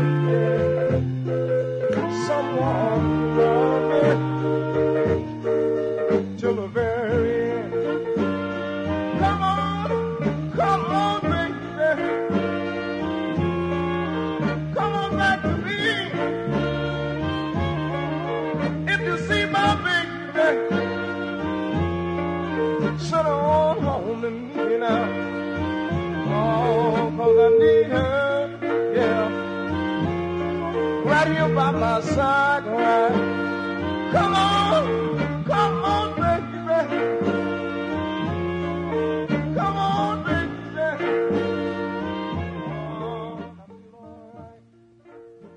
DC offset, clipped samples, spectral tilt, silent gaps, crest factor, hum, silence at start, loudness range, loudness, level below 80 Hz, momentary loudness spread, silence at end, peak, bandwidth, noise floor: under 0.1%; under 0.1%; -7 dB/octave; none; 16 dB; none; 0 s; 5 LU; -23 LUFS; -50 dBFS; 7 LU; 0 s; -6 dBFS; 10.5 kHz; -53 dBFS